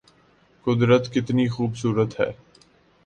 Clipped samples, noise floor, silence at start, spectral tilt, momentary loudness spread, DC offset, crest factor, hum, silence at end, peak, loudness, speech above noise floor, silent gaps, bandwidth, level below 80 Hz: under 0.1%; -58 dBFS; 0.65 s; -7 dB/octave; 9 LU; under 0.1%; 18 dB; none; 0.75 s; -6 dBFS; -23 LUFS; 37 dB; none; 9.2 kHz; -56 dBFS